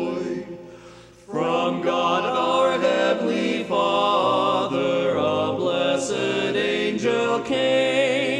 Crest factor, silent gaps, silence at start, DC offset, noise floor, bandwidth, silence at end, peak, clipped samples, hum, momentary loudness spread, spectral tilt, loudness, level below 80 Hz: 16 dB; none; 0 s; under 0.1%; -45 dBFS; 10.5 kHz; 0 s; -6 dBFS; under 0.1%; none; 6 LU; -4.5 dB/octave; -22 LUFS; -60 dBFS